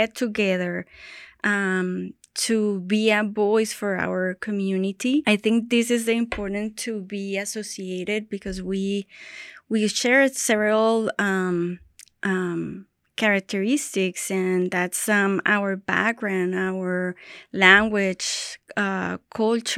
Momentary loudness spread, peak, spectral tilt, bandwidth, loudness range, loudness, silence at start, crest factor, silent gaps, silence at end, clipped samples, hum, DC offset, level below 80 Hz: 11 LU; 0 dBFS; -4 dB/octave; 15 kHz; 4 LU; -23 LUFS; 0 s; 24 dB; none; 0 s; under 0.1%; none; under 0.1%; -56 dBFS